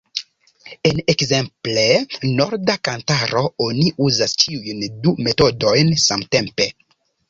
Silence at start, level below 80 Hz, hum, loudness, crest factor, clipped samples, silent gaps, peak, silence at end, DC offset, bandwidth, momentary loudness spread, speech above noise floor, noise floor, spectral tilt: 0.15 s; -48 dBFS; none; -17 LUFS; 18 dB; under 0.1%; none; -2 dBFS; 0.6 s; under 0.1%; 7.8 kHz; 6 LU; 26 dB; -44 dBFS; -4 dB/octave